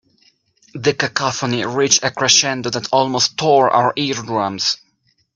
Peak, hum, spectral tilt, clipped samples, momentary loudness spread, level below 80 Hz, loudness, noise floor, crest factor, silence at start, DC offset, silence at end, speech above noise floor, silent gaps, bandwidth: 0 dBFS; none; -2.5 dB/octave; under 0.1%; 8 LU; -58 dBFS; -16 LUFS; -63 dBFS; 18 dB; 0.75 s; under 0.1%; 0.6 s; 46 dB; none; 11 kHz